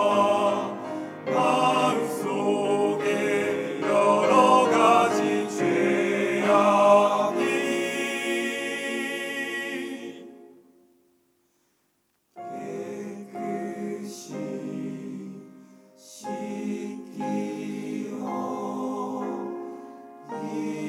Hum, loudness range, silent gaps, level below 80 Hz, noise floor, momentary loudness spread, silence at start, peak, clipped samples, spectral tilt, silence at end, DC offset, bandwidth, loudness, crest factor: none; 15 LU; none; -78 dBFS; -71 dBFS; 18 LU; 0 s; -6 dBFS; under 0.1%; -4.5 dB/octave; 0 s; under 0.1%; 16.5 kHz; -25 LUFS; 20 dB